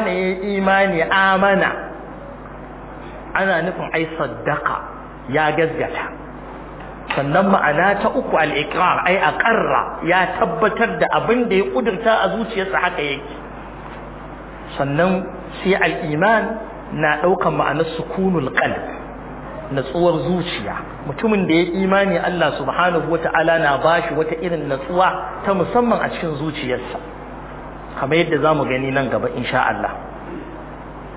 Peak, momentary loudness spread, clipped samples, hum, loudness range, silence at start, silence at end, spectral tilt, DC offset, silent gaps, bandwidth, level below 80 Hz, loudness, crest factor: -2 dBFS; 18 LU; under 0.1%; none; 5 LU; 0 s; 0 s; -9.5 dB/octave; under 0.1%; none; 4 kHz; -42 dBFS; -18 LUFS; 18 dB